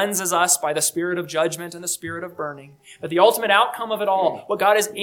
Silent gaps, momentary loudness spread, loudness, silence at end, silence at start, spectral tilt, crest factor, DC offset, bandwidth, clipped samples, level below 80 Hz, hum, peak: none; 14 LU; -20 LUFS; 0 s; 0 s; -2 dB/octave; 20 dB; under 0.1%; 19 kHz; under 0.1%; -70 dBFS; none; -2 dBFS